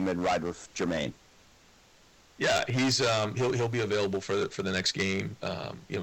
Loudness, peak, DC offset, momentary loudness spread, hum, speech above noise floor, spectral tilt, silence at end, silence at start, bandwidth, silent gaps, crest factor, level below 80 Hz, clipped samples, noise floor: -29 LUFS; -16 dBFS; under 0.1%; 10 LU; none; 30 dB; -4 dB/octave; 0 s; 0 s; 18.5 kHz; none; 14 dB; -60 dBFS; under 0.1%; -59 dBFS